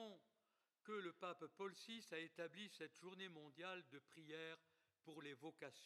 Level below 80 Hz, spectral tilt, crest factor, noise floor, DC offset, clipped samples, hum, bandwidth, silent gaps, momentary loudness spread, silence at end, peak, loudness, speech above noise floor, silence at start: under -90 dBFS; -4 dB/octave; 20 dB; -89 dBFS; under 0.1%; under 0.1%; none; 13 kHz; none; 11 LU; 0 s; -36 dBFS; -56 LUFS; 33 dB; 0 s